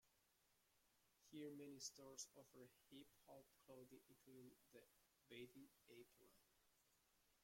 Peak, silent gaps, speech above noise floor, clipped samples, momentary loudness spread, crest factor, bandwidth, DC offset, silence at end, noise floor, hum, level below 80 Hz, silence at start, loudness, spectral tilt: -42 dBFS; none; 20 dB; under 0.1%; 12 LU; 24 dB; 16.5 kHz; under 0.1%; 0 s; -84 dBFS; none; under -90 dBFS; 0.05 s; -62 LUFS; -3 dB/octave